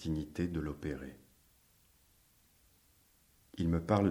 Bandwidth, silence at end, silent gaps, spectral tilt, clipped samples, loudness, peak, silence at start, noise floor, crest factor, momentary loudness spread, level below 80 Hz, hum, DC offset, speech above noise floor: over 20 kHz; 0 s; none; -8 dB/octave; under 0.1%; -36 LUFS; -14 dBFS; 0 s; -69 dBFS; 22 dB; 21 LU; -56 dBFS; none; under 0.1%; 34 dB